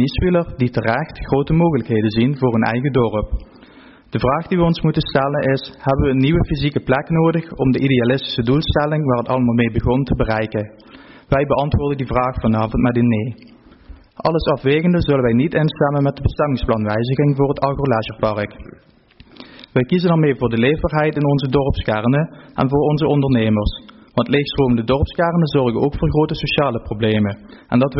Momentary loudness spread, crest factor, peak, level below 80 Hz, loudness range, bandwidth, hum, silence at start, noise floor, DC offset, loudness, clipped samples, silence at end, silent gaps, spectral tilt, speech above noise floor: 5 LU; 14 dB; -4 dBFS; -32 dBFS; 2 LU; 5.8 kHz; none; 0 s; -47 dBFS; under 0.1%; -18 LUFS; under 0.1%; 0 s; none; -6 dB/octave; 31 dB